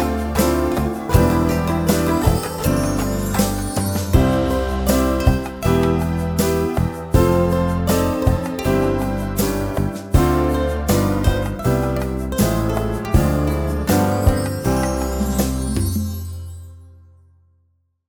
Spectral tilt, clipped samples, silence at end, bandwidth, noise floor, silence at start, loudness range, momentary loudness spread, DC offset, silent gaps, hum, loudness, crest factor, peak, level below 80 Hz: -6 dB/octave; under 0.1%; 1.15 s; over 20 kHz; -63 dBFS; 0 s; 2 LU; 5 LU; under 0.1%; none; none; -19 LUFS; 18 dB; 0 dBFS; -26 dBFS